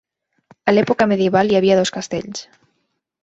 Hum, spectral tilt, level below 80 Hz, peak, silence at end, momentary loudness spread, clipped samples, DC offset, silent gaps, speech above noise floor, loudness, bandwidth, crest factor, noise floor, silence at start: none; -5 dB/octave; -56 dBFS; -2 dBFS; 0.8 s; 12 LU; under 0.1%; under 0.1%; none; 55 dB; -17 LUFS; 8 kHz; 16 dB; -71 dBFS; 0.65 s